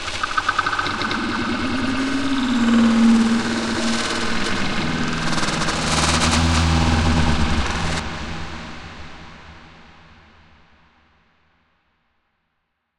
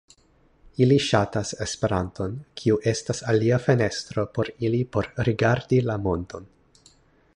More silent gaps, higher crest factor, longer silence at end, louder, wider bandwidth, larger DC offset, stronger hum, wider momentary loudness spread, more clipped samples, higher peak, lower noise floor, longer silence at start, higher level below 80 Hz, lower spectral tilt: neither; about the same, 16 dB vs 20 dB; first, 3.1 s vs 0.9 s; first, -20 LUFS vs -24 LUFS; first, 12 kHz vs 10.5 kHz; neither; neither; first, 15 LU vs 10 LU; neither; about the same, -4 dBFS vs -4 dBFS; first, -73 dBFS vs -60 dBFS; second, 0 s vs 0.8 s; first, -34 dBFS vs -48 dBFS; second, -4.5 dB/octave vs -6 dB/octave